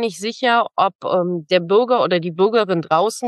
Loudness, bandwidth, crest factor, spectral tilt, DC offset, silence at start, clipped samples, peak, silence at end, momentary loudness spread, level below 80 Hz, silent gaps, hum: -18 LUFS; 12.5 kHz; 16 dB; -5 dB/octave; under 0.1%; 0 s; under 0.1%; -2 dBFS; 0 s; 4 LU; -72 dBFS; 0.95-0.99 s; none